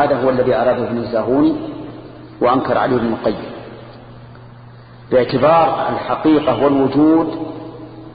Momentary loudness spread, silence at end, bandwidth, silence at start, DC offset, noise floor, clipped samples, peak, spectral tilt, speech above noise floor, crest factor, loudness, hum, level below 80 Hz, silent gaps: 20 LU; 0 s; 5 kHz; 0 s; under 0.1%; -39 dBFS; under 0.1%; -2 dBFS; -12 dB/octave; 24 dB; 14 dB; -16 LUFS; none; -46 dBFS; none